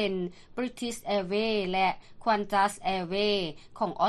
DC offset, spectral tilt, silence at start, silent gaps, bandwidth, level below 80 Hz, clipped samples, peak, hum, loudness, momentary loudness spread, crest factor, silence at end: under 0.1%; -4.5 dB/octave; 0 s; none; 13 kHz; -56 dBFS; under 0.1%; -12 dBFS; none; -29 LUFS; 9 LU; 16 dB; 0 s